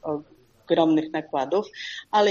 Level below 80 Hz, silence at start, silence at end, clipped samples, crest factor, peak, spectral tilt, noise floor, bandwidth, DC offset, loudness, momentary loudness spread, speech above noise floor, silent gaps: -68 dBFS; 0.05 s; 0 s; under 0.1%; 18 dB; -6 dBFS; -5.5 dB/octave; -52 dBFS; 7.2 kHz; under 0.1%; -25 LUFS; 13 LU; 29 dB; none